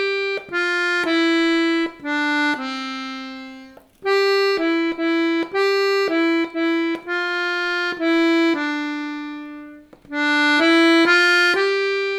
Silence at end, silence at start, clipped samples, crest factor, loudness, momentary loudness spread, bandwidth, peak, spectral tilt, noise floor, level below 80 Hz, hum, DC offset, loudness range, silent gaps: 0 s; 0 s; under 0.1%; 18 dB; -19 LUFS; 15 LU; 13 kHz; -2 dBFS; -2.5 dB/octave; -43 dBFS; -62 dBFS; none; under 0.1%; 4 LU; none